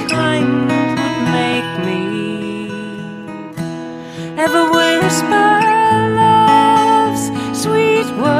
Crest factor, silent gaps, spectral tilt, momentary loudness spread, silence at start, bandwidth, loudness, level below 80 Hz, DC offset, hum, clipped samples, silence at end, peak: 14 dB; none; -4.5 dB/octave; 15 LU; 0 s; 15.5 kHz; -14 LUFS; -52 dBFS; under 0.1%; none; under 0.1%; 0 s; 0 dBFS